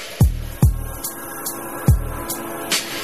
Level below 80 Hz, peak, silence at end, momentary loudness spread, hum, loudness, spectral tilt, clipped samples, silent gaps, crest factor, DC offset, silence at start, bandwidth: -26 dBFS; -4 dBFS; 0 s; 8 LU; none; -22 LUFS; -4.5 dB/octave; under 0.1%; none; 18 dB; 0.6%; 0 s; 15.5 kHz